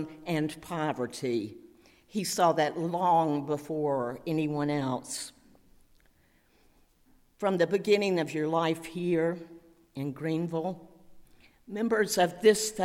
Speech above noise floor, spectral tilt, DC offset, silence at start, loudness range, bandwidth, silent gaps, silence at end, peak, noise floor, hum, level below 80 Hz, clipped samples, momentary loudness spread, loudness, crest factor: 36 dB; -5 dB/octave; under 0.1%; 0 s; 6 LU; 16.5 kHz; none; 0 s; -10 dBFS; -65 dBFS; none; -66 dBFS; under 0.1%; 12 LU; -29 LUFS; 20 dB